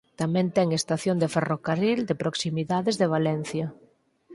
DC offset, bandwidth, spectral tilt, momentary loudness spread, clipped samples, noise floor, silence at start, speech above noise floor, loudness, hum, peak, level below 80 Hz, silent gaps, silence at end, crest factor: under 0.1%; 11.5 kHz; -5.5 dB/octave; 5 LU; under 0.1%; -54 dBFS; 0.2 s; 29 dB; -26 LUFS; none; -8 dBFS; -64 dBFS; none; 0 s; 18 dB